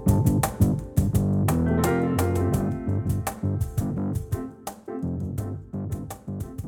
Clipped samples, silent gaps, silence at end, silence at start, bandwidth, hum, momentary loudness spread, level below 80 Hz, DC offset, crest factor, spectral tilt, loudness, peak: under 0.1%; none; 0 s; 0 s; 19.5 kHz; none; 12 LU; -38 dBFS; under 0.1%; 16 dB; -7 dB/octave; -26 LUFS; -8 dBFS